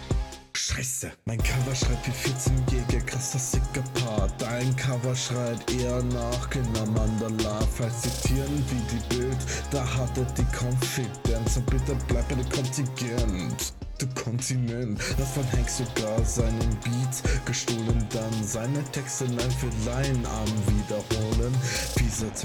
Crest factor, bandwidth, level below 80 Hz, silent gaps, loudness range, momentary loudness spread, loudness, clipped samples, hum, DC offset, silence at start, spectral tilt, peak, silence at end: 14 dB; 18.5 kHz; -32 dBFS; none; 1 LU; 3 LU; -28 LUFS; under 0.1%; none; under 0.1%; 0 s; -5 dB/octave; -12 dBFS; 0 s